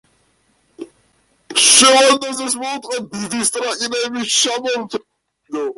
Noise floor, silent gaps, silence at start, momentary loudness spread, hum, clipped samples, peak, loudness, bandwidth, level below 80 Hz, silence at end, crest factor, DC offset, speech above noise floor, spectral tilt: -60 dBFS; none; 0.8 s; 17 LU; none; under 0.1%; 0 dBFS; -15 LUFS; 12 kHz; -62 dBFS; 0.05 s; 18 dB; under 0.1%; 43 dB; -0.5 dB/octave